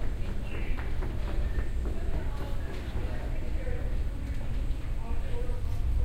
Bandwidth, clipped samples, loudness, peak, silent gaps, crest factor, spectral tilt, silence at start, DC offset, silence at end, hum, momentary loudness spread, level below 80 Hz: 8.8 kHz; under 0.1%; -36 LUFS; -16 dBFS; none; 12 dB; -7 dB/octave; 0 s; under 0.1%; 0 s; none; 3 LU; -30 dBFS